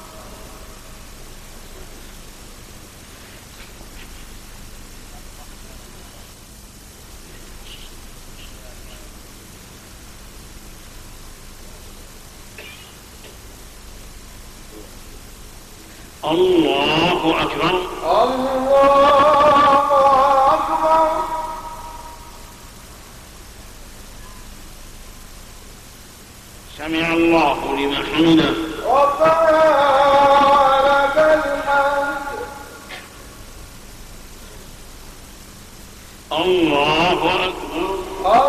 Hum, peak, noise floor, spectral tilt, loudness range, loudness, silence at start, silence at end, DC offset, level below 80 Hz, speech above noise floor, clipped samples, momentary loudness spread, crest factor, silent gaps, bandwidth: none; -6 dBFS; -40 dBFS; -4.5 dB/octave; 25 LU; -16 LUFS; 0 s; 0 s; under 0.1%; -40 dBFS; 25 dB; under 0.1%; 26 LU; 14 dB; none; 15 kHz